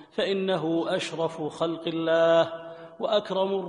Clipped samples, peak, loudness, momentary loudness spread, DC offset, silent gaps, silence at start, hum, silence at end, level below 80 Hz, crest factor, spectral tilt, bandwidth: under 0.1%; -10 dBFS; -26 LUFS; 9 LU; under 0.1%; none; 0 s; none; 0 s; -72 dBFS; 16 dB; -5.5 dB/octave; 10.5 kHz